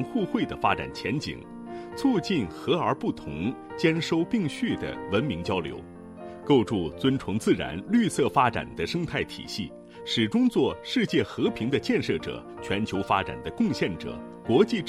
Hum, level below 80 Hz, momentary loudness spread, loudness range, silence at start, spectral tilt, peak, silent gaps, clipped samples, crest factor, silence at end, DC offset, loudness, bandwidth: none; -54 dBFS; 13 LU; 2 LU; 0 s; -6 dB/octave; -6 dBFS; none; under 0.1%; 20 dB; 0 s; under 0.1%; -27 LUFS; 13.5 kHz